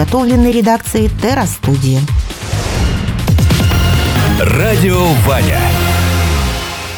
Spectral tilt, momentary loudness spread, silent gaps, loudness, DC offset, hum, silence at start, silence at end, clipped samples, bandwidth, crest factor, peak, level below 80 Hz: -5.5 dB/octave; 6 LU; none; -12 LUFS; under 0.1%; none; 0 s; 0 s; under 0.1%; over 20 kHz; 12 dB; 0 dBFS; -20 dBFS